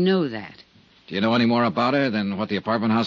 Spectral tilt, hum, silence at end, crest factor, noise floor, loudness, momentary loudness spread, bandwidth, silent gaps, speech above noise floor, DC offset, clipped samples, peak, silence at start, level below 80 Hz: -7.5 dB/octave; none; 0 s; 14 dB; -52 dBFS; -22 LUFS; 11 LU; 6.8 kHz; none; 31 dB; under 0.1%; under 0.1%; -8 dBFS; 0 s; -66 dBFS